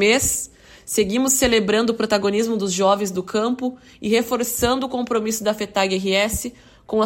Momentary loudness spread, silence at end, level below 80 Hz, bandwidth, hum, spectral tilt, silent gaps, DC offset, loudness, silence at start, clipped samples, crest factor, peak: 9 LU; 0 s; -44 dBFS; 16.5 kHz; none; -3 dB/octave; none; under 0.1%; -20 LUFS; 0 s; under 0.1%; 16 dB; -4 dBFS